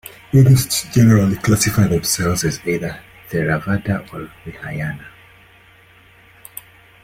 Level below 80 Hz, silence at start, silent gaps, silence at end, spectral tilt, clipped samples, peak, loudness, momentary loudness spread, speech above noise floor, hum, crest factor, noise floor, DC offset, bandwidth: -42 dBFS; 0.35 s; none; 1.95 s; -5.5 dB/octave; under 0.1%; -2 dBFS; -17 LUFS; 21 LU; 32 dB; none; 16 dB; -48 dBFS; under 0.1%; 16.5 kHz